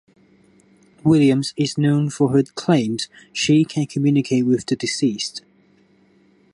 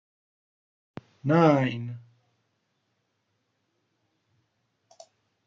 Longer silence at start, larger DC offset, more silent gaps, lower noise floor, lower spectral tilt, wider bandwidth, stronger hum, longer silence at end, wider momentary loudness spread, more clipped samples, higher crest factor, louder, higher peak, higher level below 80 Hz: second, 1.05 s vs 1.25 s; neither; neither; second, -56 dBFS vs -76 dBFS; second, -6 dB/octave vs -8 dB/octave; first, 11.5 kHz vs 7.4 kHz; neither; second, 1.15 s vs 3.45 s; second, 10 LU vs 19 LU; neither; second, 16 dB vs 24 dB; first, -19 LUFS vs -24 LUFS; about the same, -4 dBFS vs -6 dBFS; first, -58 dBFS vs -68 dBFS